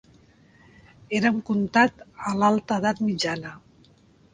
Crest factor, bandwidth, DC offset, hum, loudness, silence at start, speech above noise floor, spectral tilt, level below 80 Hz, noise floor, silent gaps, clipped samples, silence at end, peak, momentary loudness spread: 22 dB; 9.6 kHz; under 0.1%; none; -24 LUFS; 1.1 s; 33 dB; -5 dB/octave; -62 dBFS; -57 dBFS; none; under 0.1%; 0.75 s; -4 dBFS; 11 LU